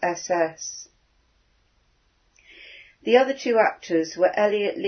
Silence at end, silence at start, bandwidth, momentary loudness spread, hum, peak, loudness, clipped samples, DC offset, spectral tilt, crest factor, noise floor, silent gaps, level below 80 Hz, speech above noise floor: 0 s; 0 s; 6.6 kHz; 21 LU; none; -4 dBFS; -22 LUFS; under 0.1%; under 0.1%; -3.5 dB/octave; 22 dB; -65 dBFS; none; -68 dBFS; 43 dB